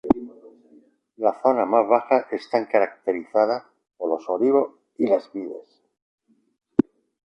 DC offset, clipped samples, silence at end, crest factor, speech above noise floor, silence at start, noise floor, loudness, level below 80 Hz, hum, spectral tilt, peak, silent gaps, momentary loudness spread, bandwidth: under 0.1%; under 0.1%; 0.45 s; 20 dB; 34 dB; 0.05 s; -56 dBFS; -23 LUFS; -60 dBFS; none; -7.5 dB/octave; -4 dBFS; 6.02-6.18 s; 13 LU; 6.6 kHz